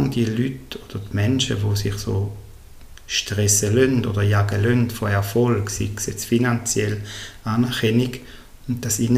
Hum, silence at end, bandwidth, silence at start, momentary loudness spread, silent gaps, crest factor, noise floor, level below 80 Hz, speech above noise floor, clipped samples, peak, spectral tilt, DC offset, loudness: none; 0 s; 15.5 kHz; 0 s; 12 LU; none; 16 dB; -41 dBFS; -42 dBFS; 20 dB; under 0.1%; -4 dBFS; -5 dB/octave; under 0.1%; -21 LUFS